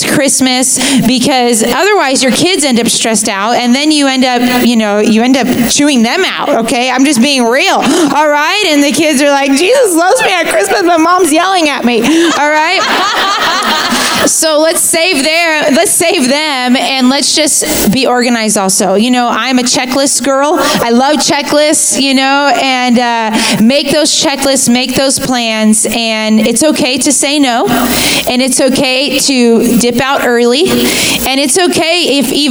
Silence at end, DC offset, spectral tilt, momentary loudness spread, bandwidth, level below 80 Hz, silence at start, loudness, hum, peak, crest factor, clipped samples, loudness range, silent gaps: 0 s; under 0.1%; -2.5 dB/octave; 2 LU; over 20 kHz; -42 dBFS; 0 s; -8 LUFS; none; 0 dBFS; 8 dB; under 0.1%; 1 LU; none